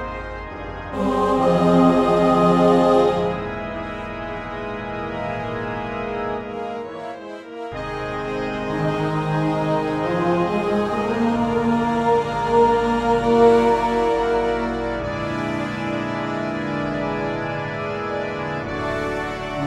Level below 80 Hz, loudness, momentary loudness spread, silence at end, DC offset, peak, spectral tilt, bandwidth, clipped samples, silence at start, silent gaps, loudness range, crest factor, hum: -42 dBFS; -21 LUFS; 14 LU; 0 s; under 0.1%; -4 dBFS; -7 dB/octave; 12 kHz; under 0.1%; 0 s; none; 10 LU; 18 dB; none